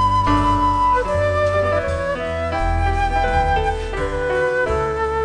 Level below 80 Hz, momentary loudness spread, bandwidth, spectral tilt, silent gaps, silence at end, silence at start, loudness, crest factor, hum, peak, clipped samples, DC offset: -26 dBFS; 6 LU; 10 kHz; -6.5 dB/octave; none; 0 s; 0 s; -19 LUFS; 12 dB; none; -6 dBFS; under 0.1%; under 0.1%